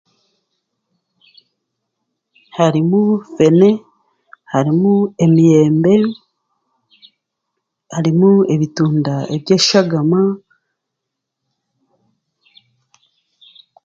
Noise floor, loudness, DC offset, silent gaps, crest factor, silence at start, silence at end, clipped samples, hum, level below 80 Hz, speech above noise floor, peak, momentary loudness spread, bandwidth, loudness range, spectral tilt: -78 dBFS; -14 LUFS; under 0.1%; none; 16 dB; 2.55 s; 3.45 s; under 0.1%; none; -58 dBFS; 66 dB; 0 dBFS; 11 LU; 7.8 kHz; 7 LU; -6.5 dB/octave